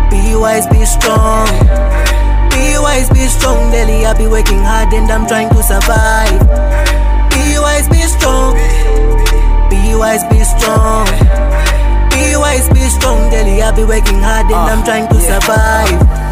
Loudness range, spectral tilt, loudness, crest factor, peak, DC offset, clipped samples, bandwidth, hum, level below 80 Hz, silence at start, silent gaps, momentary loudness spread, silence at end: 1 LU; -4.5 dB/octave; -11 LUFS; 8 dB; 0 dBFS; under 0.1%; under 0.1%; 16 kHz; none; -10 dBFS; 0 s; none; 3 LU; 0 s